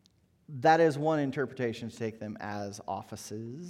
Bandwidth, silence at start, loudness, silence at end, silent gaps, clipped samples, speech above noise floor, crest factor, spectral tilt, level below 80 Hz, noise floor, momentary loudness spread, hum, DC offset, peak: 14.5 kHz; 0.5 s; -31 LUFS; 0 s; none; under 0.1%; 29 dB; 20 dB; -6 dB/octave; -72 dBFS; -60 dBFS; 16 LU; none; under 0.1%; -10 dBFS